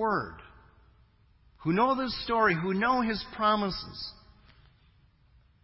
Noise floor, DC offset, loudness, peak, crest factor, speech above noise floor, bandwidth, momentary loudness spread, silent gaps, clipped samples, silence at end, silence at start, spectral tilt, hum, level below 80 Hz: -62 dBFS; under 0.1%; -28 LUFS; -12 dBFS; 18 dB; 34 dB; 5.8 kHz; 15 LU; none; under 0.1%; 1.5 s; 0 s; -9 dB/octave; none; -56 dBFS